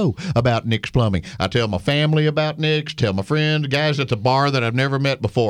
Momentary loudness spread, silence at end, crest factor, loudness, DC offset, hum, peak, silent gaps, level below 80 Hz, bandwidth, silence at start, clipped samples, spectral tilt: 3 LU; 0 s; 14 dB; -19 LUFS; under 0.1%; none; -4 dBFS; none; -44 dBFS; 11.5 kHz; 0 s; under 0.1%; -6.5 dB/octave